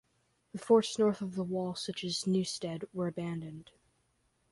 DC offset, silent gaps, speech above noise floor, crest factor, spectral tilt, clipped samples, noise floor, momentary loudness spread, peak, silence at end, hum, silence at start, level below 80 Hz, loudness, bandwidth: under 0.1%; none; 42 dB; 20 dB; -5.5 dB/octave; under 0.1%; -75 dBFS; 17 LU; -14 dBFS; 0.9 s; none; 0.55 s; -72 dBFS; -33 LUFS; 11.5 kHz